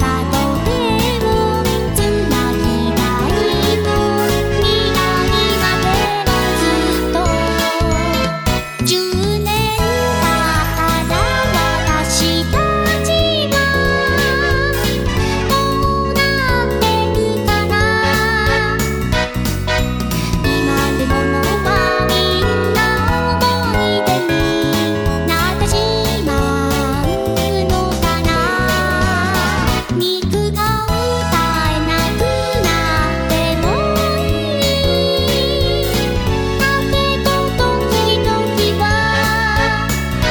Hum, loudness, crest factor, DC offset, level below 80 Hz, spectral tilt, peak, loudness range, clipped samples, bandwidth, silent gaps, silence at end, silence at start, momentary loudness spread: none; -15 LUFS; 14 dB; under 0.1%; -24 dBFS; -4.5 dB/octave; 0 dBFS; 1 LU; under 0.1%; over 20 kHz; none; 0 s; 0 s; 3 LU